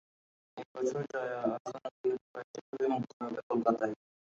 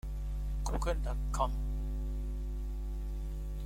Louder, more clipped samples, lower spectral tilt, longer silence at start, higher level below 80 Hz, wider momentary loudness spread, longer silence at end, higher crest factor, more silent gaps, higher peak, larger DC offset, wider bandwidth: first, -35 LUFS vs -38 LUFS; neither; about the same, -6.5 dB/octave vs -6 dB/octave; first, 0.55 s vs 0.05 s; second, -80 dBFS vs -36 dBFS; first, 14 LU vs 6 LU; first, 0.3 s vs 0 s; about the same, 22 dB vs 18 dB; first, 0.65-0.75 s, 1.60-1.65 s, 1.91-2.04 s, 2.21-2.34 s, 2.44-2.54 s, 2.61-2.73 s, 3.13-3.20 s, 3.43-3.50 s vs none; first, -14 dBFS vs -18 dBFS; neither; second, 7.8 kHz vs 13 kHz